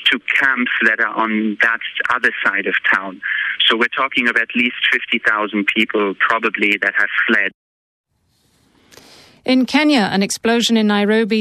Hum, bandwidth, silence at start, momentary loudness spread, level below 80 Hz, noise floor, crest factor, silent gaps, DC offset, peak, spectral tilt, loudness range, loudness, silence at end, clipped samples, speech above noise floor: none; 14 kHz; 0 s; 4 LU; -64 dBFS; -62 dBFS; 14 dB; 7.54-8.04 s; under 0.1%; -2 dBFS; -3.5 dB/octave; 3 LU; -15 LUFS; 0 s; under 0.1%; 45 dB